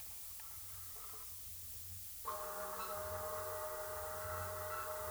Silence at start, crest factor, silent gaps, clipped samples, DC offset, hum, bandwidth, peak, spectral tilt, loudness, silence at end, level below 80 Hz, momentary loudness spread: 0 s; 16 dB; none; under 0.1%; under 0.1%; none; over 20 kHz; -30 dBFS; -2.5 dB/octave; -44 LUFS; 0 s; -64 dBFS; 4 LU